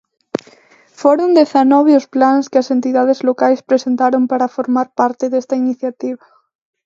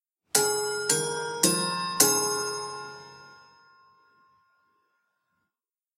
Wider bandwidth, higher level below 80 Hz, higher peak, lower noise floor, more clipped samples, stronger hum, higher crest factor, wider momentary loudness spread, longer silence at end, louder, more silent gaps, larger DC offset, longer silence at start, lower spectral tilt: second, 7.6 kHz vs 16 kHz; first, -68 dBFS vs -74 dBFS; about the same, 0 dBFS vs 0 dBFS; second, -48 dBFS vs under -90 dBFS; neither; neither; second, 14 dB vs 30 dB; about the same, 14 LU vs 16 LU; second, 0.7 s vs 2.65 s; first, -14 LUFS vs -25 LUFS; neither; neither; first, 1 s vs 0.35 s; first, -5 dB/octave vs -1.5 dB/octave